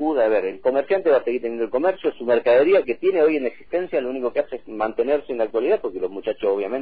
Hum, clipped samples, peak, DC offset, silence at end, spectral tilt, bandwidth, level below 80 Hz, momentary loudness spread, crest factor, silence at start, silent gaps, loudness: none; under 0.1%; -8 dBFS; 0.6%; 0 s; -8.5 dB/octave; 4.9 kHz; -56 dBFS; 9 LU; 12 dB; 0 s; none; -21 LUFS